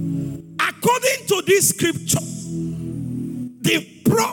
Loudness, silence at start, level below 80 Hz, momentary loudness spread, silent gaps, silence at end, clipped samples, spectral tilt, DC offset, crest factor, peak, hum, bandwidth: -20 LUFS; 0 s; -54 dBFS; 12 LU; none; 0 s; under 0.1%; -3.5 dB/octave; under 0.1%; 16 dB; -4 dBFS; none; 18 kHz